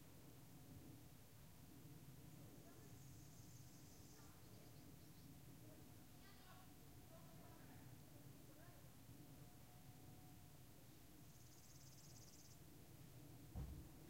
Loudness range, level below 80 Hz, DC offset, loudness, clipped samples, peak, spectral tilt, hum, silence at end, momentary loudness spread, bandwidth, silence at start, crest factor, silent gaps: 1 LU; -70 dBFS; under 0.1%; -63 LUFS; under 0.1%; -42 dBFS; -5 dB/octave; none; 0 s; 2 LU; 16 kHz; 0 s; 22 dB; none